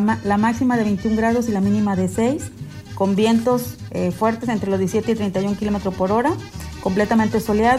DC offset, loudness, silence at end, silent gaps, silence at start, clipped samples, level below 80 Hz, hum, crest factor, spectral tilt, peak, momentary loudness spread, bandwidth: under 0.1%; -20 LUFS; 0 s; none; 0 s; under 0.1%; -42 dBFS; none; 14 dB; -6.5 dB/octave; -6 dBFS; 8 LU; 15 kHz